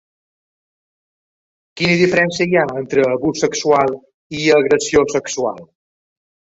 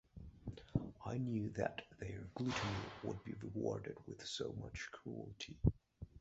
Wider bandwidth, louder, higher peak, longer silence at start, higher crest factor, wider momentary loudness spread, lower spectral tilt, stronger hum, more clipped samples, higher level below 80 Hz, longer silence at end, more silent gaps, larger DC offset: about the same, 8 kHz vs 8 kHz; first, -16 LUFS vs -44 LUFS; first, -2 dBFS vs -18 dBFS; first, 1.75 s vs 0.15 s; second, 16 dB vs 26 dB; about the same, 9 LU vs 11 LU; about the same, -4.5 dB/octave vs -5.5 dB/octave; neither; neither; first, -50 dBFS vs -56 dBFS; first, 0.85 s vs 0 s; first, 4.14-4.30 s vs none; neither